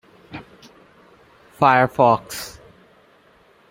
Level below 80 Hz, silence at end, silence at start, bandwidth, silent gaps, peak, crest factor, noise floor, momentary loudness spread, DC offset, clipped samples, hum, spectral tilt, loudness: -58 dBFS; 1.2 s; 0.35 s; 16.5 kHz; none; -2 dBFS; 22 dB; -54 dBFS; 24 LU; under 0.1%; under 0.1%; none; -5.5 dB/octave; -18 LUFS